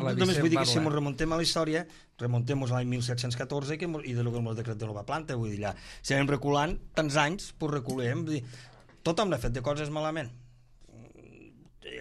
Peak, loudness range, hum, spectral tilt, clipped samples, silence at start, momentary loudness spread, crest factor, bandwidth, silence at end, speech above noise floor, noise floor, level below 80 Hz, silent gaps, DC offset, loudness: -12 dBFS; 5 LU; none; -5.5 dB/octave; under 0.1%; 0 s; 11 LU; 20 dB; 13 kHz; 0 s; 25 dB; -55 dBFS; -48 dBFS; none; under 0.1%; -30 LUFS